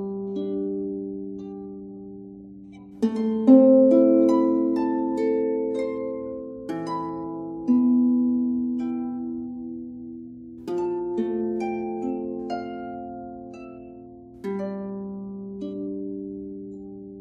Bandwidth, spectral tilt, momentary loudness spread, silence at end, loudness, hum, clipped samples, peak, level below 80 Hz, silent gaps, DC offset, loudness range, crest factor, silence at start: 6.4 kHz; -9 dB/octave; 22 LU; 0 s; -24 LUFS; none; under 0.1%; -4 dBFS; -60 dBFS; none; under 0.1%; 14 LU; 20 dB; 0 s